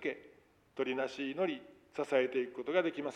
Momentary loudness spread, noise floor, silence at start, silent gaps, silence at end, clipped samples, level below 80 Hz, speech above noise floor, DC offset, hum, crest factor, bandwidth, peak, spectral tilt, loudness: 14 LU; -64 dBFS; 0 s; none; 0 s; under 0.1%; -80 dBFS; 29 dB; under 0.1%; none; 18 dB; 10 kHz; -18 dBFS; -5 dB/octave; -36 LUFS